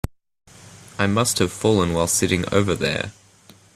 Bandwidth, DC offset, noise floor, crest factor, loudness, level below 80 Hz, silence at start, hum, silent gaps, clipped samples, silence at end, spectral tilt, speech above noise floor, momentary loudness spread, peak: 15.5 kHz; under 0.1%; -51 dBFS; 20 dB; -20 LUFS; -46 dBFS; 0.6 s; none; none; under 0.1%; 0.65 s; -4 dB/octave; 31 dB; 11 LU; -2 dBFS